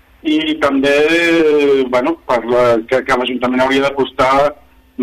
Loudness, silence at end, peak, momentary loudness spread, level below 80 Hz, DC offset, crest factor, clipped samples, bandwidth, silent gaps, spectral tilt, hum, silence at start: -13 LUFS; 0 s; -2 dBFS; 5 LU; -44 dBFS; under 0.1%; 12 dB; under 0.1%; 14 kHz; none; -5 dB/octave; none; 0.25 s